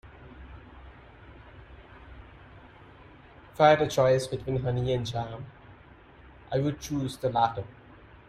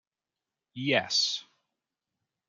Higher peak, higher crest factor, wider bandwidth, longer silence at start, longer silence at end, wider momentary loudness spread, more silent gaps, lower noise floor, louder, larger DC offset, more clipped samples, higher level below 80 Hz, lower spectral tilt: about the same, -8 dBFS vs -8 dBFS; about the same, 22 dB vs 26 dB; first, 15 kHz vs 11.5 kHz; second, 0.05 s vs 0.75 s; second, 0.55 s vs 1.05 s; first, 27 LU vs 13 LU; neither; second, -53 dBFS vs under -90 dBFS; about the same, -27 LUFS vs -27 LUFS; neither; neither; first, -52 dBFS vs -80 dBFS; first, -6 dB/octave vs -2.5 dB/octave